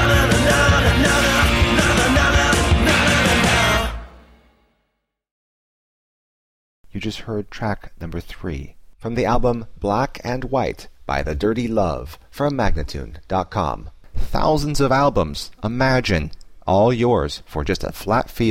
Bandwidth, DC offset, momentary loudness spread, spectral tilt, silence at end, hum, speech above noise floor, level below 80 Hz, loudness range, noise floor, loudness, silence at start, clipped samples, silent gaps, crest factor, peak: 16.5 kHz; under 0.1%; 16 LU; -4.5 dB/octave; 0 s; none; 53 dB; -28 dBFS; 15 LU; -73 dBFS; -19 LUFS; 0 s; under 0.1%; 5.31-6.84 s; 14 dB; -6 dBFS